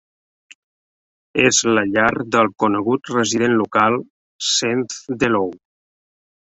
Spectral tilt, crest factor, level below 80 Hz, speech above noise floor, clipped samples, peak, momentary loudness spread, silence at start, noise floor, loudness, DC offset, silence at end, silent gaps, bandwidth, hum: -3 dB/octave; 18 dB; -56 dBFS; over 72 dB; under 0.1%; -2 dBFS; 9 LU; 1.35 s; under -90 dBFS; -18 LUFS; under 0.1%; 0.95 s; 4.10-4.39 s; 8.4 kHz; none